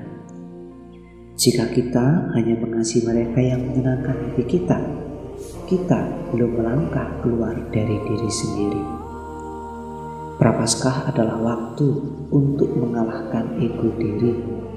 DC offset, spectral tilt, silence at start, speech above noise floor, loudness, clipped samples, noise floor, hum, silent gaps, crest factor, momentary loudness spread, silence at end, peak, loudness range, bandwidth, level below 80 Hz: 0.1%; -6 dB/octave; 0 s; 21 dB; -21 LUFS; under 0.1%; -41 dBFS; none; none; 20 dB; 14 LU; 0 s; 0 dBFS; 3 LU; 15.5 kHz; -42 dBFS